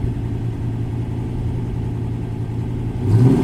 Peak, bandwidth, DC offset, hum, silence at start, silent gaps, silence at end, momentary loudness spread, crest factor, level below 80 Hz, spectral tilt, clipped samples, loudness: -2 dBFS; 9.2 kHz; under 0.1%; none; 0 s; none; 0 s; 8 LU; 18 dB; -32 dBFS; -9.5 dB/octave; under 0.1%; -22 LUFS